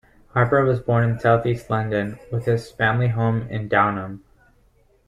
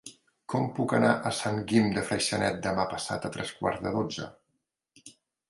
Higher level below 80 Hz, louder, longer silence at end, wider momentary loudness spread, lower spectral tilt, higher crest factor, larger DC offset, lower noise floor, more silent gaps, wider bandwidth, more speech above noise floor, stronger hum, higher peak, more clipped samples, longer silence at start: first, -50 dBFS vs -58 dBFS; first, -21 LUFS vs -29 LUFS; first, 0.9 s vs 0.4 s; about the same, 8 LU vs 10 LU; first, -8 dB/octave vs -5 dB/octave; about the same, 18 dB vs 22 dB; neither; second, -58 dBFS vs -80 dBFS; neither; second, 9.4 kHz vs 11.5 kHz; second, 38 dB vs 51 dB; neither; first, -4 dBFS vs -8 dBFS; neither; first, 0.35 s vs 0.05 s